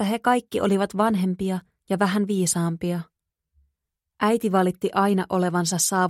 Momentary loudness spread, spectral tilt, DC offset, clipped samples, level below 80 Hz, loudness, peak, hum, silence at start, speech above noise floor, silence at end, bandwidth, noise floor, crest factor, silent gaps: 7 LU; -5 dB/octave; under 0.1%; under 0.1%; -60 dBFS; -23 LUFS; -6 dBFS; none; 0 s; 59 dB; 0 s; 15.5 kHz; -82 dBFS; 16 dB; none